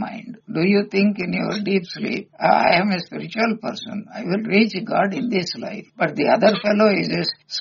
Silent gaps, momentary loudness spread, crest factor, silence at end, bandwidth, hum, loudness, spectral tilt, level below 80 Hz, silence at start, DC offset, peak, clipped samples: none; 12 LU; 18 dB; 0 s; 7.2 kHz; none; -20 LUFS; -4 dB/octave; -62 dBFS; 0 s; under 0.1%; -2 dBFS; under 0.1%